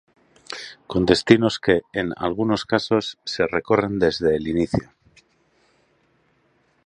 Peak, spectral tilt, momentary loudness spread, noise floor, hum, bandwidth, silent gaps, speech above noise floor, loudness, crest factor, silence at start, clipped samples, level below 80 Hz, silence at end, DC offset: 0 dBFS; -5.5 dB/octave; 11 LU; -64 dBFS; none; 11 kHz; none; 43 dB; -21 LUFS; 22 dB; 0.5 s; under 0.1%; -48 dBFS; 2.05 s; under 0.1%